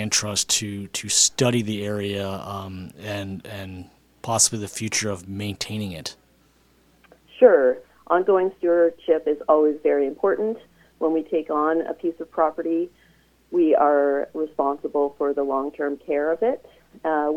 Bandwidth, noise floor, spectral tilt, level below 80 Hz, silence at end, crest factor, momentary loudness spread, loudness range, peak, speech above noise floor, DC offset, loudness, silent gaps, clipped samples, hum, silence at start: 16 kHz; -59 dBFS; -3.5 dB/octave; -60 dBFS; 0 s; 22 dB; 15 LU; 6 LU; -2 dBFS; 37 dB; under 0.1%; -22 LUFS; none; under 0.1%; none; 0 s